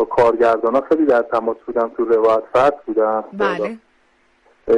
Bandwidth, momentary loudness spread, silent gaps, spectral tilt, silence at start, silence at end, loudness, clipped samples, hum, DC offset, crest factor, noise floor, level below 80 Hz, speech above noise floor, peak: 9.4 kHz; 8 LU; none; -6.5 dB/octave; 0 s; 0 s; -17 LUFS; under 0.1%; none; under 0.1%; 12 dB; -58 dBFS; -52 dBFS; 41 dB; -6 dBFS